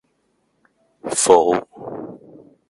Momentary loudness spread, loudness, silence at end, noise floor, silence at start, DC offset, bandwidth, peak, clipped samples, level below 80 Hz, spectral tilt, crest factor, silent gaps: 21 LU; -16 LUFS; 0.55 s; -67 dBFS; 1.05 s; under 0.1%; 11.5 kHz; 0 dBFS; under 0.1%; -60 dBFS; -3 dB/octave; 22 dB; none